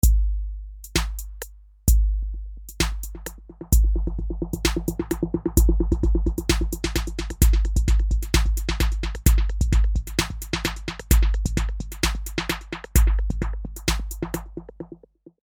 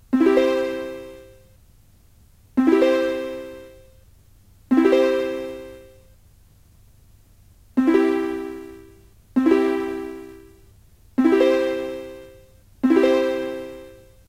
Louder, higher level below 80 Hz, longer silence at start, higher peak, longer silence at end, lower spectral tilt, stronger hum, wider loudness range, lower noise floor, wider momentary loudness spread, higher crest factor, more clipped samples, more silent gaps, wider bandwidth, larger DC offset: second, -24 LUFS vs -20 LUFS; first, -24 dBFS vs -54 dBFS; about the same, 0.05 s vs 0.1 s; about the same, -2 dBFS vs -4 dBFS; about the same, 0.45 s vs 0.35 s; about the same, -4.5 dB/octave vs -5.5 dB/octave; neither; about the same, 4 LU vs 4 LU; second, -47 dBFS vs -53 dBFS; second, 14 LU vs 22 LU; about the same, 20 dB vs 18 dB; neither; neither; first, 20 kHz vs 15.5 kHz; neither